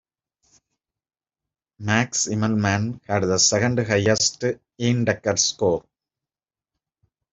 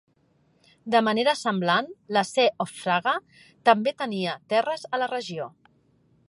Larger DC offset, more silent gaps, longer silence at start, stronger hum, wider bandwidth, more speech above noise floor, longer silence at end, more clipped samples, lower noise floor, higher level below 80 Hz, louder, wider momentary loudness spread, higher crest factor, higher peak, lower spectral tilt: neither; neither; first, 1.8 s vs 0.85 s; neither; second, 8.2 kHz vs 11.5 kHz; first, over 69 dB vs 40 dB; first, 1.55 s vs 0.8 s; neither; first, under -90 dBFS vs -65 dBFS; first, -58 dBFS vs -76 dBFS; first, -21 LUFS vs -25 LUFS; about the same, 8 LU vs 9 LU; about the same, 20 dB vs 22 dB; about the same, -2 dBFS vs -4 dBFS; about the same, -3.5 dB/octave vs -4.5 dB/octave